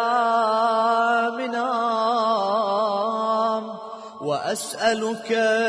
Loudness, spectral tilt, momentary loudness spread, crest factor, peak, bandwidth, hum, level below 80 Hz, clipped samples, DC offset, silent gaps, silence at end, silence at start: -22 LUFS; -3.5 dB/octave; 8 LU; 14 dB; -8 dBFS; 11 kHz; none; -74 dBFS; under 0.1%; under 0.1%; none; 0 s; 0 s